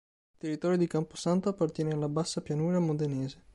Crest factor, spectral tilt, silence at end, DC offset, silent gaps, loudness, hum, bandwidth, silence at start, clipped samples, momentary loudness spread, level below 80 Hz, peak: 14 dB; -6.5 dB/octave; 0.2 s; under 0.1%; none; -31 LUFS; none; 11.5 kHz; 0.45 s; under 0.1%; 5 LU; -64 dBFS; -16 dBFS